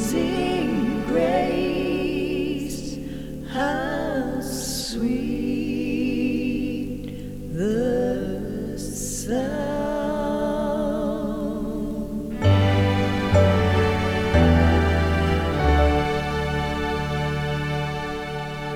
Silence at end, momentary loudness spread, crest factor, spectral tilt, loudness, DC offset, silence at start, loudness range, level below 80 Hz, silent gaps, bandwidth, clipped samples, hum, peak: 0 s; 11 LU; 18 dB; -6 dB/octave; -23 LUFS; under 0.1%; 0 s; 7 LU; -32 dBFS; none; 17 kHz; under 0.1%; none; -4 dBFS